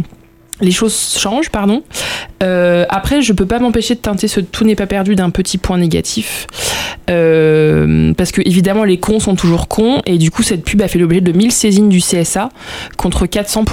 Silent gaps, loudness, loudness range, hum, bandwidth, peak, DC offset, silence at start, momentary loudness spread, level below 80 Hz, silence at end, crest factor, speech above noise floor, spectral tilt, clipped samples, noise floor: none; -13 LUFS; 3 LU; none; 17 kHz; -2 dBFS; under 0.1%; 0 s; 8 LU; -30 dBFS; 0 s; 10 dB; 28 dB; -5 dB/octave; under 0.1%; -40 dBFS